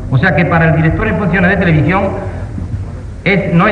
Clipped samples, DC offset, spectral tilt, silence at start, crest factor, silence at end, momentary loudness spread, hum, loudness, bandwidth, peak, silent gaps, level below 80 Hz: under 0.1%; under 0.1%; -8.5 dB/octave; 0 s; 12 dB; 0 s; 12 LU; none; -12 LUFS; 5.8 kHz; 0 dBFS; none; -26 dBFS